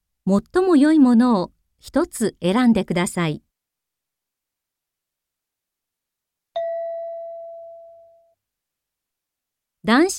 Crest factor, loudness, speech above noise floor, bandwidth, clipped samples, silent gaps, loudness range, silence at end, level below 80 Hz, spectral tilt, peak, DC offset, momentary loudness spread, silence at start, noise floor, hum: 16 dB; -19 LUFS; 67 dB; 15 kHz; under 0.1%; none; 17 LU; 0 s; -56 dBFS; -5.5 dB/octave; -6 dBFS; under 0.1%; 19 LU; 0.25 s; -84 dBFS; none